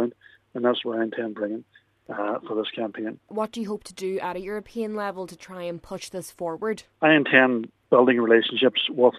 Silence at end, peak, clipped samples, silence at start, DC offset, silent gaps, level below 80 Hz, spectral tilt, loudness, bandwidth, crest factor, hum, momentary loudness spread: 0 s; -2 dBFS; under 0.1%; 0 s; under 0.1%; none; -66 dBFS; -5 dB/octave; -24 LUFS; 14 kHz; 24 dB; none; 17 LU